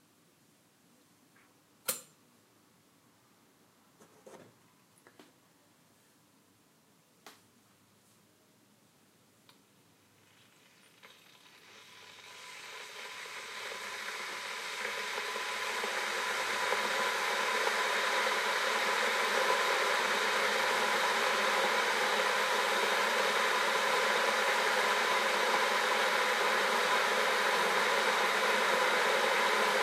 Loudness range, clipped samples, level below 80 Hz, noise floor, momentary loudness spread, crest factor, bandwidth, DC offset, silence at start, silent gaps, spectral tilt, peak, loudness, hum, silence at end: 17 LU; under 0.1%; under -90 dBFS; -67 dBFS; 12 LU; 18 dB; 16 kHz; under 0.1%; 1.85 s; none; -0.5 dB/octave; -14 dBFS; -30 LUFS; none; 0 s